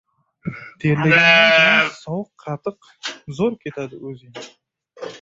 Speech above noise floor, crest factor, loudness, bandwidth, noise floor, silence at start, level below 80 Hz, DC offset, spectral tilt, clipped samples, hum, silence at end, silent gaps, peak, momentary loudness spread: 20 dB; 20 dB; -14 LUFS; 7.8 kHz; -39 dBFS; 0.45 s; -60 dBFS; under 0.1%; -5 dB/octave; under 0.1%; none; 0.05 s; none; 0 dBFS; 24 LU